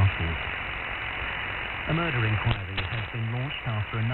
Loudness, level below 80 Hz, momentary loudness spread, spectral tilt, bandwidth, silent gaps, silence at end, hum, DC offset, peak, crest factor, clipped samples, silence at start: -29 LUFS; -42 dBFS; 5 LU; -8.5 dB/octave; 4.3 kHz; none; 0 s; none; under 0.1%; -10 dBFS; 18 dB; under 0.1%; 0 s